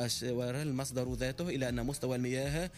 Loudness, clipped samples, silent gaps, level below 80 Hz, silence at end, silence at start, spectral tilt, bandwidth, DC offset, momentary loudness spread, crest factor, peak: -35 LUFS; under 0.1%; none; -50 dBFS; 0 s; 0 s; -5 dB/octave; 15.5 kHz; under 0.1%; 2 LU; 12 dB; -22 dBFS